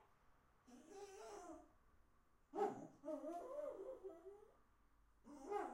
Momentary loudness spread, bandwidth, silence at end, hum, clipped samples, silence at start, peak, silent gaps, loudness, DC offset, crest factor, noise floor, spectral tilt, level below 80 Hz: 17 LU; 16 kHz; 0 s; none; under 0.1%; 0 s; -30 dBFS; none; -52 LUFS; under 0.1%; 22 dB; -75 dBFS; -5 dB/octave; -78 dBFS